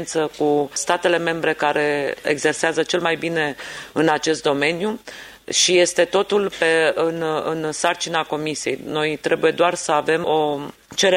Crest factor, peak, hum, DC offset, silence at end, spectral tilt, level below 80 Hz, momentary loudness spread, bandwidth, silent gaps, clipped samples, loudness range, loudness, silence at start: 18 dB; -2 dBFS; none; under 0.1%; 0 s; -3 dB/octave; -60 dBFS; 7 LU; 16 kHz; none; under 0.1%; 2 LU; -20 LUFS; 0 s